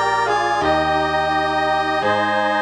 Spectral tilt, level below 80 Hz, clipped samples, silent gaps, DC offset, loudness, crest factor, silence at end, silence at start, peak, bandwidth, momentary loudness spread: -4.5 dB/octave; -46 dBFS; under 0.1%; none; under 0.1%; -18 LUFS; 12 dB; 0 s; 0 s; -6 dBFS; 10.5 kHz; 1 LU